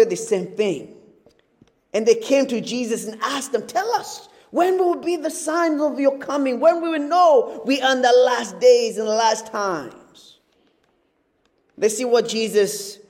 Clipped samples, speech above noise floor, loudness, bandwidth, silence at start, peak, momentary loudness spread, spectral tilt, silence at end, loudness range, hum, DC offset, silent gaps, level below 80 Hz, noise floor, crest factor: under 0.1%; 47 dB; -20 LUFS; 16.5 kHz; 0 s; -4 dBFS; 10 LU; -3.5 dB/octave; 0.15 s; 7 LU; none; under 0.1%; none; -72 dBFS; -66 dBFS; 16 dB